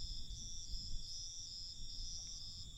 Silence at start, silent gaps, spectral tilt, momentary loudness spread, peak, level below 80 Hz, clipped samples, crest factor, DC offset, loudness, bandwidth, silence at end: 0 s; none; -1.5 dB/octave; 2 LU; -30 dBFS; -50 dBFS; under 0.1%; 14 dB; under 0.1%; -47 LUFS; 11.5 kHz; 0 s